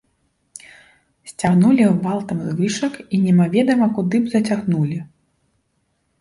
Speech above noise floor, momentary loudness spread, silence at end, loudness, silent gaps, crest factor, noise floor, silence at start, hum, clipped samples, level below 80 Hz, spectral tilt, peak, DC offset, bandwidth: 51 dB; 15 LU; 1.15 s; -18 LUFS; none; 16 dB; -68 dBFS; 1.25 s; none; under 0.1%; -56 dBFS; -7 dB/octave; -4 dBFS; under 0.1%; 11.5 kHz